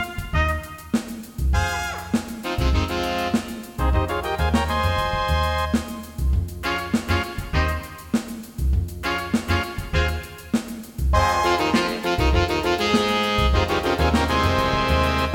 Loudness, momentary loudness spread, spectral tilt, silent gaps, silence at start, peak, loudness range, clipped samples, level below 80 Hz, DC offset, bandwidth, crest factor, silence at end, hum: -23 LUFS; 7 LU; -5.5 dB/octave; none; 0 s; -6 dBFS; 5 LU; under 0.1%; -28 dBFS; under 0.1%; 17.5 kHz; 16 dB; 0 s; none